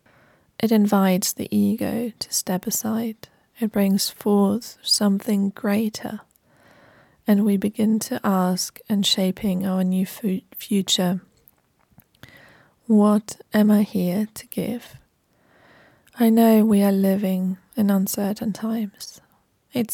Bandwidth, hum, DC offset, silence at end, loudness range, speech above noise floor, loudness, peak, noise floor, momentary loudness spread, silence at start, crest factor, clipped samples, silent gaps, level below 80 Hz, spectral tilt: 17.5 kHz; none; under 0.1%; 0 s; 3 LU; 41 dB; -21 LUFS; -6 dBFS; -62 dBFS; 11 LU; 0.6 s; 16 dB; under 0.1%; none; -64 dBFS; -5 dB/octave